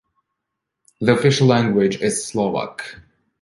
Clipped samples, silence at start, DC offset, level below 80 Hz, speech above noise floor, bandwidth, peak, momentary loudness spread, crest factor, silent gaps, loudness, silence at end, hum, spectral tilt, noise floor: under 0.1%; 1 s; under 0.1%; -56 dBFS; 62 dB; 11.5 kHz; -2 dBFS; 15 LU; 18 dB; none; -18 LUFS; 0.45 s; none; -5.5 dB/octave; -80 dBFS